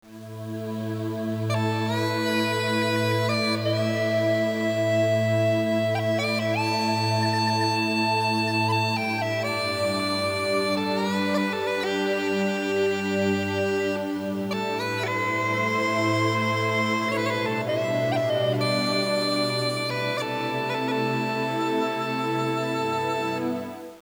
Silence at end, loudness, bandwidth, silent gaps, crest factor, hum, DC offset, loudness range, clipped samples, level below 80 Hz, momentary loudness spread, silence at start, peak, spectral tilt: 0 s; -25 LUFS; over 20 kHz; none; 14 dB; none; under 0.1%; 2 LU; under 0.1%; -72 dBFS; 4 LU; 0.05 s; -12 dBFS; -5.5 dB/octave